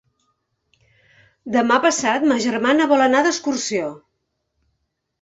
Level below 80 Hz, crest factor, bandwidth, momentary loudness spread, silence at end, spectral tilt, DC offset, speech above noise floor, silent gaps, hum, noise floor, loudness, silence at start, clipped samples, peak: -64 dBFS; 20 dB; 8.2 kHz; 9 LU; 1.25 s; -3 dB/octave; under 0.1%; 56 dB; none; none; -74 dBFS; -18 LUFS; 1.45 s; under 0.1%; -2 dBFS